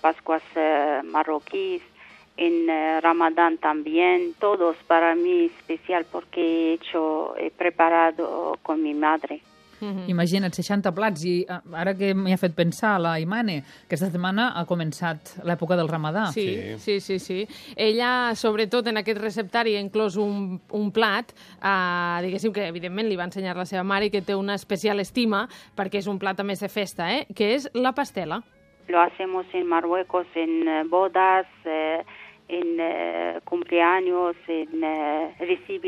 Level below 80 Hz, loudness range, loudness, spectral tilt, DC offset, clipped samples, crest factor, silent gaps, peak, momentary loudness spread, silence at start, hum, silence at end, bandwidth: -66 dBFS; 4 LU; -24 LUFS; -6 dB/octave; under 0.1%; under 0.1%; 20 dB; none; -4 dBFS; 9 LU; 0.05 s; none; 0 s; 14.5 kHz